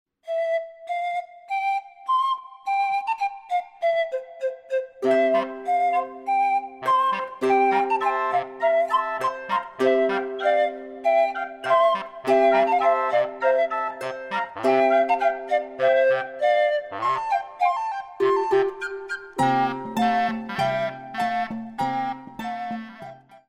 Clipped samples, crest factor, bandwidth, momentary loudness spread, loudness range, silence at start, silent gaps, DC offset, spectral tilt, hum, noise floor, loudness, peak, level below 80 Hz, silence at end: under 0.1%; 16 dB; 15 kHz; 11 LU; 4 LU; 0.25 s; none; under 0.1%; -5 dB/octave; none; -43 dBFS; -23 LUFS; -8 dBFS; -66 dBFS; 0.1 s